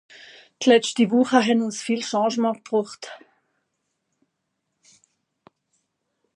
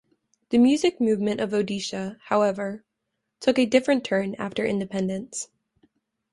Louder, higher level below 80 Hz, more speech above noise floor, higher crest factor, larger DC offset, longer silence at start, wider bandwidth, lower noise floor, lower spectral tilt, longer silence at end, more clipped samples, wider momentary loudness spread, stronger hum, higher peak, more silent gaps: first, -21 LUFS vs -24 LUFS; second, -76 dBFS vs -64 dBFS; about the same, 57 dB vs 57 dB; about the same, 22 dB vs 20 dB; neither; about the same, 0.6 s vs 0.5 s; about the same, 11 kHz vs 11.5 kHz; about the same, -77 dBFS vs -80 dBFS; about the same, -4 dB/octave vs -5 dB/octave; first, 3.2 s vs 0.9 s; neither; about the same, 11 LU vs 13 LU; neither; first, -2 dBFS vs -6 dBFS; neither